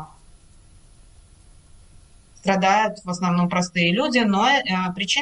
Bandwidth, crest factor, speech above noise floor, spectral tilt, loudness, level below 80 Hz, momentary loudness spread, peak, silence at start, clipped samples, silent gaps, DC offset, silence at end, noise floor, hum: 10.5 kHz; 18 dB; 29 dB; -4.5 dB/octave; -20 LUFS; -52 dBFS; 6 LU; -6 dBFS; 0 s; under 0.1%; none; under 0.1%; 0 s; -50 dBFS; none